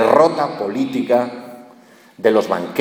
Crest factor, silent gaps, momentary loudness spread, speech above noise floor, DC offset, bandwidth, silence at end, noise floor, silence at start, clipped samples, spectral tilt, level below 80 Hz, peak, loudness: 18 dB; none; 14 LU; 29 dB; under 0.1%; 19 kHz; 0 s; -46 dBFS; 0 s; under 0.1%; -6 dB/octave; -64 dBFS; 0 dBFS; -18 LUFS